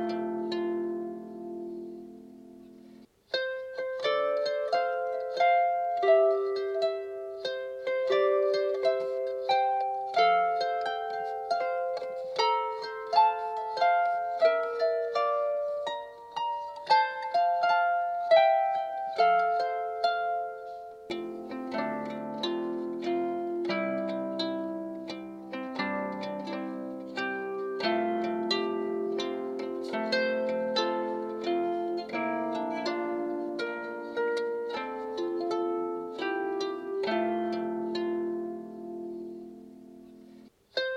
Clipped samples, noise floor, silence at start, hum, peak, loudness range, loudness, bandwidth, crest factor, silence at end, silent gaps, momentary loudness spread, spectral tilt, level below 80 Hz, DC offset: under 0.1%; -54 dBFS; 0 s; none; -10 dBFS; 7 LU; -30 LUFS; 9.4 kHz; 18 dB; 0 s; none; 13 LU; -5 dB/octave; -76 dBFS; under 0.1%